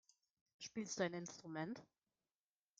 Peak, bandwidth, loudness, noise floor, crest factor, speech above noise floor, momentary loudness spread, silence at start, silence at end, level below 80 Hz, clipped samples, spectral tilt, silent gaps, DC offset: -28 dBFS; 9.4 kHz; -47 LUFS; under -90 dBFS; 22 dB; over 44 dB; 11 LU; 0.6 s; 0.95 s; -88 dBFS; under 0.1%; -4 dB/octave; none; under 0.1%